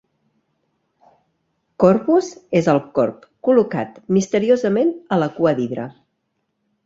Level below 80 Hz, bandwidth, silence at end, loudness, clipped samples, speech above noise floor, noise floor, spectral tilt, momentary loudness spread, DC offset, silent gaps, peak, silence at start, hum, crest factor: -60 dBFS; 7.8 kHz; 0.95 s; -18 LUFS; under 0.1%; 55 dB; -72 dBFS; -7 dB/octave; 8 LU; under 0.1%; none; -2 dBFS; 1.8 s; none; 18 dB